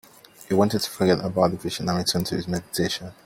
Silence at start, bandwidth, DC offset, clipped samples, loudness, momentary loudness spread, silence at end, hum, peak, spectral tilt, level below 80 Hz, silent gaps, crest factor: 0.4 s; 17 kHz; under 0.1%; under 0.1%; -24 LUFS; 6 LU; 0.15 s; none; -6 dBFS; -5 dB/octave; -54 dBFS; none; 20 dB